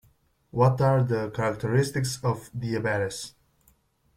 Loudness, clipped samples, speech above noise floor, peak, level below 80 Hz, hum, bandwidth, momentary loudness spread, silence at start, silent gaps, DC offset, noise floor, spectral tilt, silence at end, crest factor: -26 LUFS; under 0.1%; 40 dB; -6 dBFS; -56 dBFS; none; 15 kHz; 10 LU; 0.55 s; none; under 0.1%; -65 dBFS; -6 dB/octave; 0.85 s; 20 dB